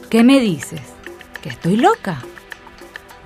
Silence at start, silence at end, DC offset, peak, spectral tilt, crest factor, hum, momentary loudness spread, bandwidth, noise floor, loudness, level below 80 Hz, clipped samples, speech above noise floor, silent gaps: 0 s; 0.4 s; under 0.1%; -2 dBFS; -5.5 dB/octave; 16 dB; none; 24 LU; 15.5 kHz; -38 dBFS; -15 LUFS; -52 dBFS; under 0.1%; 23 dB; none